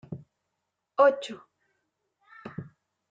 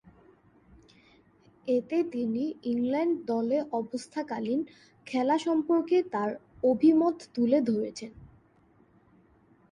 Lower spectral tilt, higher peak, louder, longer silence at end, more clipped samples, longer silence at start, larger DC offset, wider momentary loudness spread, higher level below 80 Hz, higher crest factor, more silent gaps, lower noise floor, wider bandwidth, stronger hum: about the same, -5.5 dB/octave vs -6.5 dB/octave; first, -8 dBFS vs -12 dBFS; first, -25 LUFS vs -28 LUFS; second, 0.5 s vs 1.45 s; neither; second, 0.1 s vs 1.65 s; neither; first, 23 LU vs 11 LU; second, -74 dBFS vs -68 dBFS; about the same, 22 dB vs 18 dB; neither; first, -83 dBFS vs -63 dBFS; second, 9 kHz vs 10.5 kHz; neither